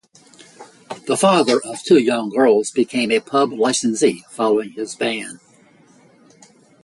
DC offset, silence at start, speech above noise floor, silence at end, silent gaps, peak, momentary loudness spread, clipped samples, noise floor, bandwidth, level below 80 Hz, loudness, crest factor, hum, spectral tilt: under 0.1%; 0.6 s; 34 dB; 1.45 s; none; -2 dBFS; 10 LU; under 0.1%; -51 dBFS; 11.5 kHz; -66 dBFS; -18 LUFS; 16 dB; none; -4 dB/octave